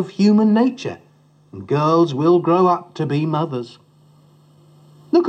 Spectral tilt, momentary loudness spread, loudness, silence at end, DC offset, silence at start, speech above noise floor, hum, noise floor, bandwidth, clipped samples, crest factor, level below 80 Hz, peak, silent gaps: -8 dB/octave; 16 LU; -17 LUFS; 0 s; under 0.1%; 0 s; 36 dB; none; -53 dBFS; 8.4 kHz; under 0.1%; 14 dB; -72 dBFS; -4 dBFS; none